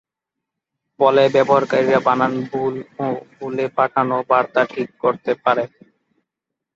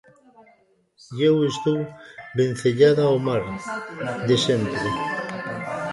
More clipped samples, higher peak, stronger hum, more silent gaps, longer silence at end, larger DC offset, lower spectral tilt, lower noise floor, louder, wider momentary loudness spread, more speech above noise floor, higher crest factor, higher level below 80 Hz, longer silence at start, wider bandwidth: neither; first, 0 dBFS vs -4 dBFS; neither; neither; first, 1.1 s vs 0 s; neither; about the same, -6.5 dB/octave vs -6 dB/octave; first, -83 dBFS vs -60 dBFS; first, -18 LUFS vs -22 LUFS; about the same, 11 LU vs 13 LU; first, 65 dB vs 38 dB; about the same, 18 dB vs 20 dB; second, -64 dBFS vs -56 dBFS; about the same, 1 s vs 1.1 s; second, 7.6 kHz vs 11.5 kHz